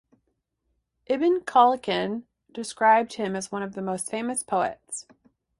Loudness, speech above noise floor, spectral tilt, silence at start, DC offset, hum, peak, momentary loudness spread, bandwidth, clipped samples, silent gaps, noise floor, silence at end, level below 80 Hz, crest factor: -24 LUFS; 52 dB; -4 dB/octave; 1.1 s; under 0.1%; none; -6 dBFS; 17 LU; 11.5 kHz; under 0.1%; none; -76 dBFS; 0.6 s; -68 dBFS; 20 dB